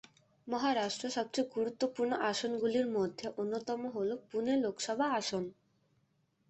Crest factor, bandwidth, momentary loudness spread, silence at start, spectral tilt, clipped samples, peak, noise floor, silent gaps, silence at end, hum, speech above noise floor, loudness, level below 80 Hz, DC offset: 16 dB; 8.2 kHz; 6 LU; 0.45 s; -4 dB/octave; under 0.1%; -18 dBFS; -75 dBFS; none; 0.95 s; none; 41 dB; -35 LUFS; -76 dBFS; under 0.1%